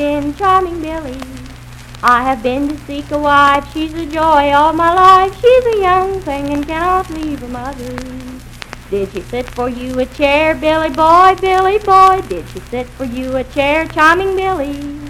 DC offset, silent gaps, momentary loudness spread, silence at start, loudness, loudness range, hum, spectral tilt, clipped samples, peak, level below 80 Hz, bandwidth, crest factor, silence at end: under 0.1%; none; 17 LU; 0 s; -13 LUFS; 9 LU; none; -5 dB/octave; 0.5%; 0 dBFS; -34 dBFS; 16 kHz; 14 dB; 0 s